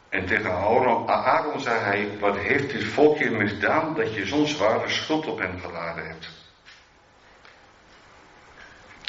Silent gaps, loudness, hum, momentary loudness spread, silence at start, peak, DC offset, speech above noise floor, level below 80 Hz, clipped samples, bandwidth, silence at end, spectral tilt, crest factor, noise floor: none; -23 LUFS; none; 11 LU; 0.1 s; -6 dBFS; under 0.1%; 31 dB; -62 dBFS; under 0.1%; 7.6 kHz; 0 s; -3 dB/octave; 20 dB; -55 dBFS